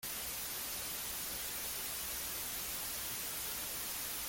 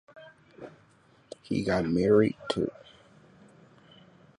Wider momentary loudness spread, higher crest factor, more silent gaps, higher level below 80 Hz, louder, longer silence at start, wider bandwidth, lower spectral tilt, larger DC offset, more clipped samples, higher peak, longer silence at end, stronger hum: second, 1 LU vs 26 LU; second, 12 dB vs 20 dB; neither; about the same, -60 dBFS vs -58 dBFS; second, -38 LUFS vs -27 LUFS; second, 0 s vs 0.15 s; first, 17 kHz vs 11 kHz; second, 0 dB/octave vs -7 dB/octave; neither; neither; second, -28 dBFS vs -10 dBFS; second, 0 s vs 1.7 s; neither